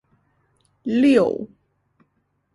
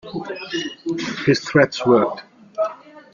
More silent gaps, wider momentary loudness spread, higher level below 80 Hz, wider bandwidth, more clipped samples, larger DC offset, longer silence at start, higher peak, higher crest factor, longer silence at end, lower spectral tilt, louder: neither; first, 18 LU vs 13 LU; about the same, -62 dBFS vs -60 dBFS; first, 11 kHz vs 7.4 kHz; neither; neither; first, 0.85 s vs 0.05 s; about the same, -4 dBFS vs -2 dBFS; about the same, 18 dB vs 18 dB; first, 1.1 s vs 0.15 s; about the same, -6.5 dB/octave vs -5.5 dB/octave; about the same, -19 LUFS vs -20 LUFS